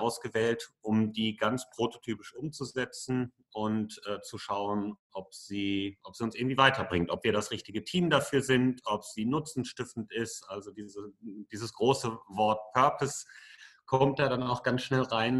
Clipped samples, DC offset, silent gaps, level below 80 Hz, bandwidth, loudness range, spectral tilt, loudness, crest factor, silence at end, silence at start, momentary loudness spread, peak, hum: under 0.1%; under 0.1%; 4.99-5.10 s; -64 dBFS; 12.5 kHz; 7 LU; -5 dB/octave; -31 LUFS; 26 dB; 0 s; 0 s; 14 LU; -6 dBFS; none